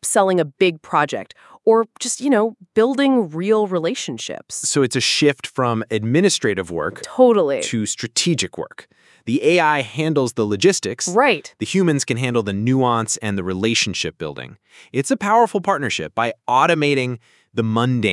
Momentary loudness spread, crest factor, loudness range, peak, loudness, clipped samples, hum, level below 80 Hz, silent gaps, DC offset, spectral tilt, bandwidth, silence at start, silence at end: 10 LU; 18 dB; 2 LU; 0 dBFS; -19 LUFS; under 0.1%; none; -64 dBFS; none; under 0.1%; -4 dB/octave; 12 kHz; 0.05 s; 0 s